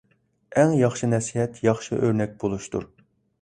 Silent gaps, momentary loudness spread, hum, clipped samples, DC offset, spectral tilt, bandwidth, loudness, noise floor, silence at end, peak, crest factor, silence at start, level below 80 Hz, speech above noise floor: none; 10 LU; none; under 0.1%; under 0.1%; -6.5 dB/octave; 11 kHz; -24 LUFS; -51 dBFS; 0.55 s; -6 dBFS; 18 dB; 0.5 s; -54 dBFS; 28 dB